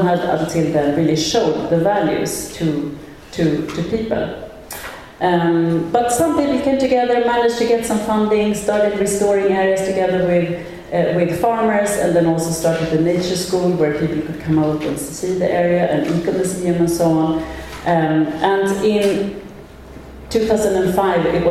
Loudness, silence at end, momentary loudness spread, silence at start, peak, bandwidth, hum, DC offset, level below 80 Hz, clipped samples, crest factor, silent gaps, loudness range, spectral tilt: -17 LUFS; 0 s; 8 LU; 0 s; -2 dBFS; 15.5 kHz; none; under 0.1%; -42 dBFS; under 0.1%; 14 dB; none; 3 LU; -5.5 dB/octave